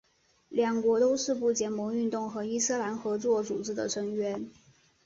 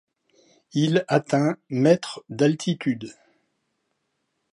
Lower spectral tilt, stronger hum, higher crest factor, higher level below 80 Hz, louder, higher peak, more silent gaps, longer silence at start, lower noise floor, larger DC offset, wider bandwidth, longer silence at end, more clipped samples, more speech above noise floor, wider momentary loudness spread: second, -3.5 dB/octave vs -6.5 dB/octave; neither; about the same, 16 dB vs 20 dB; about the same, -70 dBFS vs -72 dBFS; second, -30 LUFS vs -23 LUFS; second, -14 dBFS vs -4 dBFS; neither; second, 0.5 s vs 0.75 s; second, -60 dBFS vs -75 dBFS; neither; second, 8 kHz vs 11 kHz; second, 0.55 s vs 1.4 s; neither; second, 30 dB vs 53 dB; second, 8 LU vs 11 LU